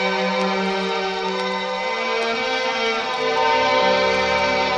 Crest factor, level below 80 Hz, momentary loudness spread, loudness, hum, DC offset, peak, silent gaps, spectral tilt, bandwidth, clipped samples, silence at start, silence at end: 16 dB; -50 dBFS; 6 LU; -20 LUFS; none; under 0.1%; -6 dBFS; none; -3.5 dB/octave; 10.5 kHz; under 0.1%; 0 s; 0 s